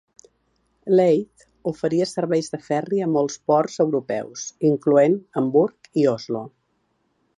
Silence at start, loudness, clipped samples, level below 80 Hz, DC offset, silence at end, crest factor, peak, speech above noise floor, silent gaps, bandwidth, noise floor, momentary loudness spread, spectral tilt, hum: 0.85 s; -21 LUFS; under 0.1%; -68 dBFS; under 0.1%; 0.9 s; 16 dB; -6 dBFS; 49 dB; none; 11.5 kHz; -69 dBFS; 13 LU; -6.5 dB/octave; none